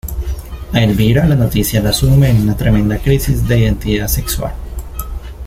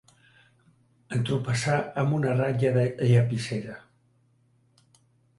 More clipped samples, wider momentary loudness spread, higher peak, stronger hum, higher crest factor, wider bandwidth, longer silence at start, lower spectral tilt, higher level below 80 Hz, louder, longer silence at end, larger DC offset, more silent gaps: neither; first, 15 LU vs 11 LU; first, -2 dBFS vs -10 dBFS; neither; second, 12 dB vs 18 dB; first, 16.5 kHz vs 11.5 kHz; second, 0.05 s vs 1.1 s; about the same, -6 dB/octave vs -6.5 dB/octave; first, -22 dBFS vs -60 dBFS; first, -14 LUFS vs -26 LUFS; second, 0 s vs 1.6 s; neither; neither